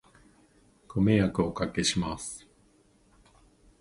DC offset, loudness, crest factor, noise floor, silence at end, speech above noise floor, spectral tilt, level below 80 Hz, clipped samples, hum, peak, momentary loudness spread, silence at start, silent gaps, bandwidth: under 0.1%; -28 LUFS; 22 dB; -63 dBFS; 1.4 s; 36 dB; -5 dB/octave; -50 dBFS; under 0.1%; none; -10 dBFS; 14 LU; 0.9 s; none; 11.5 kHz